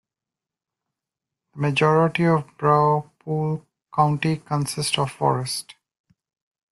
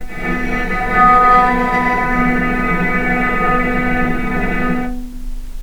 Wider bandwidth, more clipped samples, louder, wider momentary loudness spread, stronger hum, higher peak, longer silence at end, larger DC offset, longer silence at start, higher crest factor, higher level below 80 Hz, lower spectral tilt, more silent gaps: second, 12.5 kHz vs 18 kHz; neither; second, -22 LUFS vs -15 LUFS; about the same, 10 LU vs 12 LU; neither; second, -4 dBFS vs 0 dBFS; first, 1 s vs 0 s; neither; first, 1.55 s vs 0 s; first, 20 dB vs 14 dB; second, -60 dBFS vs -24 dBFS; about the same, -5.5 dB/octave vs -6.5 dB/octave; neither